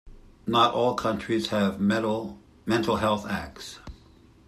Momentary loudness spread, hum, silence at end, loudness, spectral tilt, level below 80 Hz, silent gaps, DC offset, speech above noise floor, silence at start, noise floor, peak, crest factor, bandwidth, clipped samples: 17 LU; none; 0.5 s; -26 LUFS; -5.5 dB/octave; -52 dBFS; none; under 0.1%; 29 dB; 0.05 s; -54 dBFS; -8 dBFS; 20 dB; 14 kHz; under 0.1%